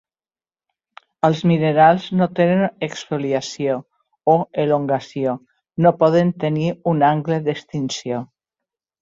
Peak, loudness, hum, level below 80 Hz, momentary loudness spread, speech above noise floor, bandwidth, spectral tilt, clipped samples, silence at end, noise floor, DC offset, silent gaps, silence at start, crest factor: -2 dBFS; -19 LUFS; none; -60 dBFS; 11 LU; over 72 dB; 7.8 kHz; -7 dB/octave; under 0.1%; 0.75 s; under -90 dBFS; under 0.1%; none; 1.25 s; 18 dB